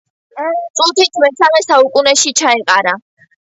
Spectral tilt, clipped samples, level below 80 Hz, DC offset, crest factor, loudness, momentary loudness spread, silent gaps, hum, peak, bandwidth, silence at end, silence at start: 0 dB/octave; under 0.1%; -62 dBFS; under 0.1%; 12 dB; -11 LUFS; 9 LU; 0.70-0.74 s; none; 0 dBFS; 8.2 kHz; 0.45 s; 0.35 s